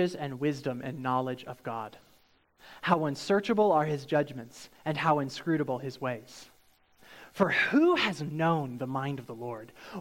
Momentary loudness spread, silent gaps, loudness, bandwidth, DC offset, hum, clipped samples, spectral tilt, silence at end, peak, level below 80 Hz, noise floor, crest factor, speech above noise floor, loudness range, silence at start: 16 LU; none; -30 LUFS; 17 kHz; under 0.1%; none; under 0.1%; -6 dB/octave; 0 s; -8 dBFS; -68 dBFS; -65 dBFS; 22 dB; 35 dB; 4 LU; 0 s